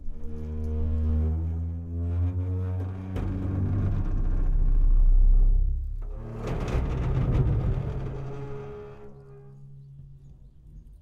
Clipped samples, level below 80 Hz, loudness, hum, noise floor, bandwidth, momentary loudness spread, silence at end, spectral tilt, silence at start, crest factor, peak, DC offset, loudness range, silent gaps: under 0.1%; -26 dBFS; -29 LUFS; none; -49 dBFS; 3.8 kHz; 22 LU; 0.05 s; -9.5 dB/octave; 0 s; 14 dB; -10 dBFS; under 0.1%; 4 LU; none